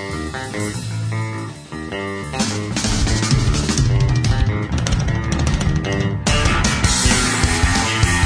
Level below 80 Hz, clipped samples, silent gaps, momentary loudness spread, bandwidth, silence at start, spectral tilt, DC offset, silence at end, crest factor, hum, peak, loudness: -24 dBFS; under 0.1%; none; 10 LU; 11 kHz; 0 s; -4 dB/octave; under 0.1%; 0 s; 18 dB; none; 0 dBFS; -18 LUFS